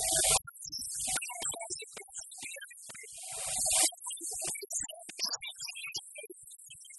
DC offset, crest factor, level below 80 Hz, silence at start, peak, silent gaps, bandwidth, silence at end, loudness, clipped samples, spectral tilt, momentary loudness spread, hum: under 0.1%; 24 dB; -60 dBFS; 0 s; -12 dBFS; none; 12 kHz; 0 s; -33 LUFS; under 0.1%; 0.5 dB/octave; 19 LU; none